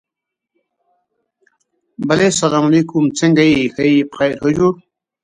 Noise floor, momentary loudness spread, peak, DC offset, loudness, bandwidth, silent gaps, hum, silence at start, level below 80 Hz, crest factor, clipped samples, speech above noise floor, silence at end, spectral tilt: -82 dBFS; 6 LU; 0 dBFS; under 0.1%; -14 LUFS; 11 kHz; none; none; 2 s; -50 dBFS; 16 dB; under 0.1%; 68 dB; 0.5 s; -5 dB/octave